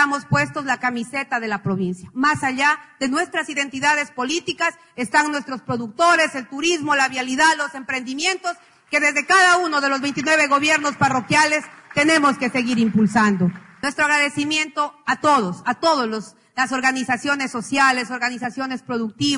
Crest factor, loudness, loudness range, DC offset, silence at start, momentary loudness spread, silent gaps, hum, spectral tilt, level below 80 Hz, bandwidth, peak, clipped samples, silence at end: 16 dB; -19 LUFS; 4 LU; under 0.1%; 0 s; 10 LU; none; none; -3.5 dB/octave; -60 dBFS; 11 kHz; -4 dBFS; under 0.1%; 0 s